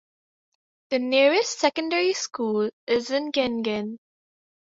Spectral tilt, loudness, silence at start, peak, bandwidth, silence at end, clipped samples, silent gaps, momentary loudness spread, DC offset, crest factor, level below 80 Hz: -3 dB/octave; -24 LUFS; 0.9 s; -6 dBFS; 8 kHz; 0.75 s; under 0.1%; 2.73-2.87 s; 9 LU; under 0.1%; 20 dB; -68 dBFS